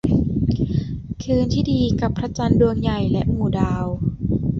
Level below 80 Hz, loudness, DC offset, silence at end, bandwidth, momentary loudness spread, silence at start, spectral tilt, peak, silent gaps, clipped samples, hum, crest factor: -32 dBFS; -21 LUFS; under 0.1%; 0 s; 7.6 kHz; 7 LU; 0.05 s; -8 dB/octave; -2 dBFS; none; under 0.1%; none; 16 dB